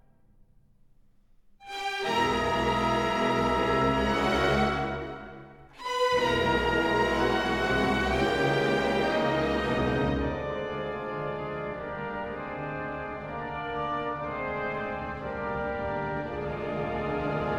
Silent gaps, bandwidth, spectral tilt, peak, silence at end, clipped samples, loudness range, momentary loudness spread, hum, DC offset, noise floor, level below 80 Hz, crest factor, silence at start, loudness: none; 16 kHz; -5.5 dB/octave; -12 dBFS; 0 s; under 0.1%; 8 LU; 10 LU; none; under 0.1%; -59 dBFS; -44 dBFS; 16 dB; 1.6 s; -28 LUFS